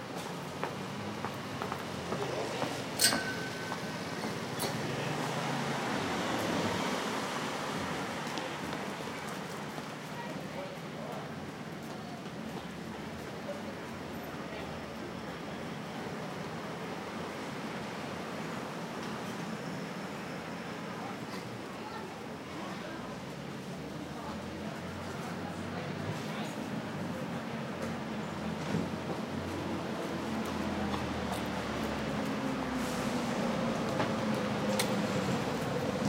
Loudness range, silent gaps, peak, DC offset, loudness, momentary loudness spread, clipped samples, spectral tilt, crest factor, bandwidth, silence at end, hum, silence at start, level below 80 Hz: 8 LU; none; -10 dBFS; under 0.1%; -36 LUFS; 9 LU; under 0.1%; -4.5 dB/octave; 26 dB; 16 kHz; 0 s; none; 0 s; -60 dBFS